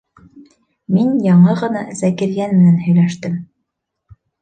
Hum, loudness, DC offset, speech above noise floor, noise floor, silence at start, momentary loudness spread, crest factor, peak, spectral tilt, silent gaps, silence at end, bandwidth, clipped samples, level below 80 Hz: none; -14 LUFS; under 0.1%; 62 dB; -75 dBFS; 0.35 s; 11 LU; 14 dB; -2 dBFS; -8 dB/octave; none; 0.95 s; 9.2 kHz; under 0.1%; -56 dBFS